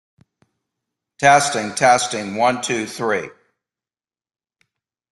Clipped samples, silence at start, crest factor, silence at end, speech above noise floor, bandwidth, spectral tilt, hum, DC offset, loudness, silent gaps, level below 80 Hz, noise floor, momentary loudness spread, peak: under 0.1%; 1.2 s; 20 dB; 1.85 s; over 73 dB; 12.5 kHz; -3 dB/octave; none; under 0.1%; -18 LUFS; none; -64 dBFS; under -90 dBFS; 9 LU; -2 dBFS